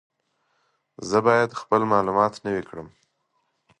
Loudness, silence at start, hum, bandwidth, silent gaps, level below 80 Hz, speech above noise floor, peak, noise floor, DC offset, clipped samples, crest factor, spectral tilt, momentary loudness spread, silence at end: -22 LUFS; 1 s; none; 11 kHz; none; -60 dBFS; 50 dB; -4 dBFS; -72 dBFS; under 0.1%; under 0.1%; 20 dB; -6 dB/octave; 18 LU; 0.95 s